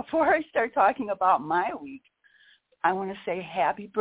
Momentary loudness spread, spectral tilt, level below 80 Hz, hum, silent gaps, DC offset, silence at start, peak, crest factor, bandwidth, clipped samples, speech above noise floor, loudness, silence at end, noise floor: 9 LU; -8.5 dB/octave; -66 dBFS; none; none; under 0.1%; 0 s; -8 dBFS; 18 dB; 4 kHz; under 0.1%; 35 dB; -26 LUFS; 0 s; -61 dBFS